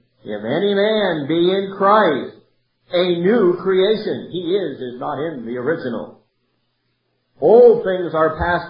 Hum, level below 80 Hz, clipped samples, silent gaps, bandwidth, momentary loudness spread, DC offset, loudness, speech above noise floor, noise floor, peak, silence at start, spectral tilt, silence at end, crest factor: none; -46 dBFS; under 0.1%; none; 5.4 kHz; 14 LU; under 0.1%; -17 LUFS; 51 dB; -68 dBFS; 0 dBFS; 0.25 s; -11 dB/octave; 0 s; 16 dB